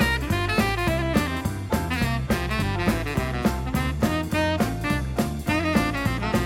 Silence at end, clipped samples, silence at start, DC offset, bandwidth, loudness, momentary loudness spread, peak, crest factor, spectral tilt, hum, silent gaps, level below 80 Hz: 0 s; under 0.1%; 0 s; under 0.1%; 16.5 kHz; -24 LUFS; 4 LU; -8 dBFS; 16 dB; -5.5 dB/octave; none; none; -34 dBFS